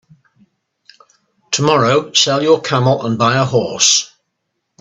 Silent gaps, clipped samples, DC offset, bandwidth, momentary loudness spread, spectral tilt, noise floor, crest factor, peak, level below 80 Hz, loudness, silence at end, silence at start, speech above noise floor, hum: none; under 0.1%; under 0.1%; 8.4 kHz; 5 LU; -3.5 dB/octave; -72 dBFS; 16 dB; 0 dBFS; -56 dBFS; -13 LUFS; 0.75 s; 1.5 s; 59 dB; none